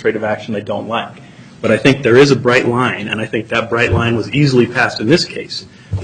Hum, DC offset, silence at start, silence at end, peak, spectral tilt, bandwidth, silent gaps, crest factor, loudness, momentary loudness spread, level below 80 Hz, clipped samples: none; under 0.1%; 0 s; 0 s; 0 dBFS; -6 dB/octave; 10 kHz; none; 14 dB; -14 LUFS; 12 LU; -42 dBFS; under 0.1%